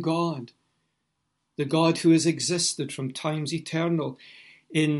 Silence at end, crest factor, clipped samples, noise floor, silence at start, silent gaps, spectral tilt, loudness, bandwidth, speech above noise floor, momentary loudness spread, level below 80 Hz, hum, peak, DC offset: 0 s; 18 dB; under 0.1%; -77 dBFS; 0 s; none; -4.5 dB/octave; -25 LUFS; 11.5 kHz; 52 dB; 13 LU; -72 dBFS; none; -8 dBFS; under 0.1%